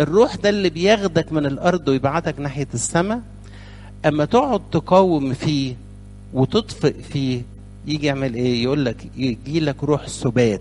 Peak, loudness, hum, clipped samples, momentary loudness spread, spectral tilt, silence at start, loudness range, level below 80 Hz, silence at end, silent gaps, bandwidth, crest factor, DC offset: 0 dBFS; -20 LUFS; 50 Hz at -40 dBFS; under 0.1%; 12 LU; -5.5 dB/octave; 0 s; 3 LU; -42 dBFS; 0 s; none; 11.5 kHz; 18 dB; under 0.1%